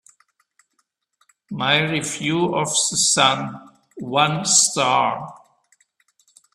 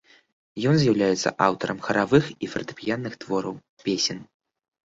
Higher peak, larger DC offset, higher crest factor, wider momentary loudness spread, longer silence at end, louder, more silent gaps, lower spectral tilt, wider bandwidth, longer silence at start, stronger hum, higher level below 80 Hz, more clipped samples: about the same, -2 dBFS vs -2 dBFS; neither; about the same, 22 dB vs 22 dB; first, 17 LU vs 11 LU; first, 1.2 s vs 0.65 s; first, -18 LUFS vs -24 LUFS; second, none vs 3.69-3.77 s; second, -2 dB/octave vs -5 dB/octave; first, 13.5 kHz vs 7.8 kHz; first, 1.5 s vs 0.55 s; neither; second, -64 dBFS vs -58 dBFS; neither